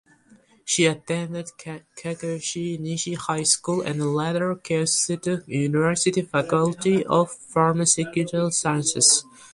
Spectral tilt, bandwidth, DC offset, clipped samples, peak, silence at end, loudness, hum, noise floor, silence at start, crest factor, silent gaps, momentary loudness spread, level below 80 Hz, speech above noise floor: -3.5 dB/octave; 11.5 kHz; under 0.1%; under 0.1%; -4 dBFS; 0.05 s; -22 LUFS; none; -56 dBFS; 0.65 s; 20 dB; none; 11 LU; -62 dBFS; 33 dB